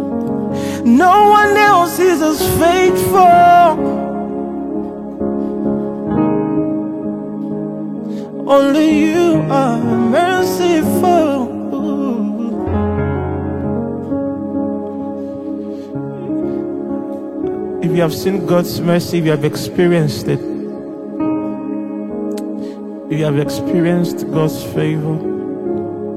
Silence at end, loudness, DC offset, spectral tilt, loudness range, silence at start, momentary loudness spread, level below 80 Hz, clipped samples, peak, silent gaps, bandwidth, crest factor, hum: 0 s; -15 LUFS; under 0.1%; -6 dB/octave; 10 LU; 0 s; 14 LU; -42 dBFS; under 0.1%; 0 dBFS; none; 16 kHz; 14 dB; none